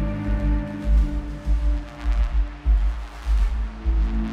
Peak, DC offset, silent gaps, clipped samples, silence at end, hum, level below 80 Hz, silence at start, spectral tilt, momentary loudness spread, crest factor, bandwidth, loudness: -10 dBFS; under 0.1%; none; under 0.1%; 0 s; none; -22 dBFS; 0 s; -8 dB/octave; 5 LU; 12 dB; 5.4 kHz; -25 LUFS